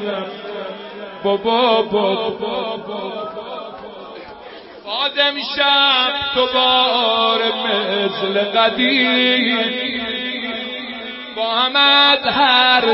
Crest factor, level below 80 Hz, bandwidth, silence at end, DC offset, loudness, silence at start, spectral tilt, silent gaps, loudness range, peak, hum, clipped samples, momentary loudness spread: 16 dB; -56 dBFS; 5.8 kHz; 0 s; under 0.1%; -15 LUFS; 0 s; -7.5 dB/octave; none; 7 LU; -2 dBFS; none; under 0.1%; 19 LU